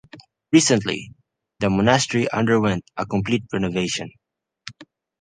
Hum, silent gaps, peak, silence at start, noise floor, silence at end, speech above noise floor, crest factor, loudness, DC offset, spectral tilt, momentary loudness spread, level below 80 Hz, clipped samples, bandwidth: none; none; -2 dBFS; 0.15 s; -48 dBFS; 0.4 s; 28 dB; 20 dB; -21 LUFS; under 0.1%; -4.5 dB/octave; 21 LU; -50 dBFS; under 0.1%; 10 kHz